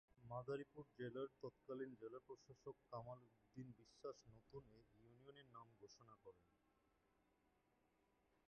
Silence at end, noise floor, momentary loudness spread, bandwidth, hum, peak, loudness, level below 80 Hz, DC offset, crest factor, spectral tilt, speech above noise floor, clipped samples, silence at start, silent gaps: 2.05 s; -83 dBFS; 14 LU; 6.8 kHz; none; -38 dBFS; -57 LUFS; -84 dBFS; under 0.1%; 20 dB; -6 dB/octave; 26 dB; under 0.1%; 0.15 s; none